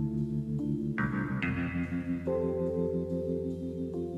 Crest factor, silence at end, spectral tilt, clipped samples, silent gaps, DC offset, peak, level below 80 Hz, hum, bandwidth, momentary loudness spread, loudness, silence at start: 14 dB; 0 s; -9.5 dB/octave; under 0.1%; none; under 0.1%; -18 dBFS; -50 dBFS; none; 9.2 kHz; 4 LU; -33 LUFS; 0 s